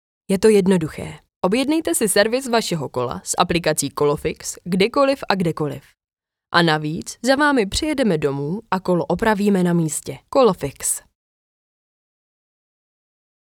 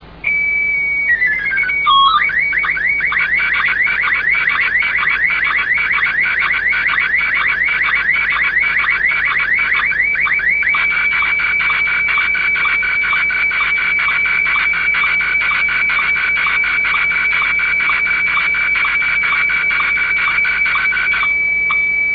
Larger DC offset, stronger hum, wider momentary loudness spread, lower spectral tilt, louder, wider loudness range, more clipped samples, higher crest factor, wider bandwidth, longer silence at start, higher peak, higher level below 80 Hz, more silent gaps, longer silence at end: neither; neither; first, 10 LU vs 1 LU; about the same, -4.5 dB/octave vs -3.5 dB/octave; second, -19 LUFS vs -12 LUFS; first, 3 LU vs 0 LU; neither; first, 20 dB vs 14 dB; first, 18 kHz vs 5.4 kHz; first, 0.3 s vs 0 s; about the same, 0 dBFS vs -2 dBFS; about the same, -46 dBFS vs -42 dBFS; first, 1.36-1.41 s vs none; first, 2.6 s vs 0 s